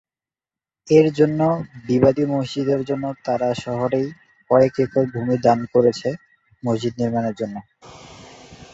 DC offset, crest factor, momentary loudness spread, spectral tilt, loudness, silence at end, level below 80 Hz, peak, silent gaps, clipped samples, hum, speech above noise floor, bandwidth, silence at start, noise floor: under 0.1%; 18 dB; 11 LU; -7.5 dB/octave; -20 LUFS; 0.1 s; -56 dBFS; -2 dBFS; none; under 0.1%; none; over 71 dB; 8 kHz; 0.85 s; under -90 dBFS